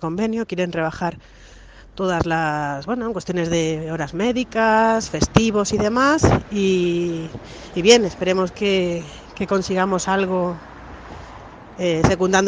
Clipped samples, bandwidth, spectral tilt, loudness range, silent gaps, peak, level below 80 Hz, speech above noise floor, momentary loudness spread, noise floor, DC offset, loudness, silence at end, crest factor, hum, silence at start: under 0.1%; 10 kHz; -5 dB/octave; 6 LU; none; 0 dBFS; -40 dBFS; 20 dB; 19 LU; -39 dBFS; under 0.1%; -20 LUFS; 0 s; 20 dB; none; 0 s